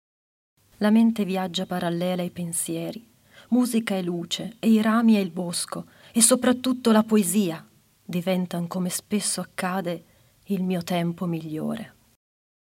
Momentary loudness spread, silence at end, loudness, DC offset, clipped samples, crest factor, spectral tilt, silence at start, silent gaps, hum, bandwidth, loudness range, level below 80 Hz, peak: 12 LU; 0.85 s; -24 LUFS; under 0.1%; under 0.1%; 22 dB; -4.5 dB/octave; 0.8 s; none; none; 16.5 kHz; 7 LU; -68 dBFS; -2 dBFS